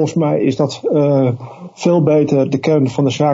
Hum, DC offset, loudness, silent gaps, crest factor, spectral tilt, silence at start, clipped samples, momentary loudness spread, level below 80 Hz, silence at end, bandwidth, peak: none; under 0.1%; -15 LUFS; none; 14 dB; -7.5 dB/octave; 0 s; under 0.1%; 6 LU; -58 dBFS; 0 s; 8 kHz; 0 dBFS